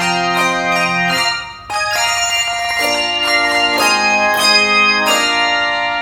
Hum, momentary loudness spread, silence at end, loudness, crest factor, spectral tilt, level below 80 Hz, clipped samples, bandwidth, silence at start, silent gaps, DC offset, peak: none; 6 LU; 0 s; -13 LUFS; 14 dB; -1.5 dB/octave; -48 dBFS; under 0.1%; 18 kHz; 0 s; none; under 0.1%; 0 dBFS